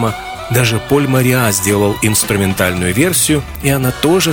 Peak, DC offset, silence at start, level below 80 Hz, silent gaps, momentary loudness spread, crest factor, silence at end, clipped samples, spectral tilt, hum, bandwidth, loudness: 0 dBFS; under 0.1%; 0 s; -36 dBFS; none; 4 LU; 12 dB; 0 s; under 0.1%; -4 dB/octave; none; 19 kHz; -13 LUFS